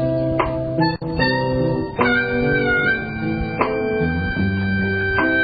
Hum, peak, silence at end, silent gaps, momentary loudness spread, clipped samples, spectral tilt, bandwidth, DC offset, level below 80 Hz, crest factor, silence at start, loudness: none; -4 dBFS; 0 s; none; 4 LU; under 0.1%; -11.5 dB/octave; 5 kHz; 0.3%; -36 dBFS; 16 dB; 0 s; -20 LUFS